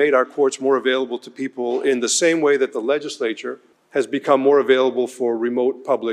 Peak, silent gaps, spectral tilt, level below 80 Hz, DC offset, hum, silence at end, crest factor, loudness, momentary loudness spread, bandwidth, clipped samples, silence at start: -2 dBFS; none; -3 dB/octave; -74 dBFS; under 0.1%; none; 0 s; 18 dB; -19 LUFS; 11 LU; 12 kHz; under 0.1%; 0 s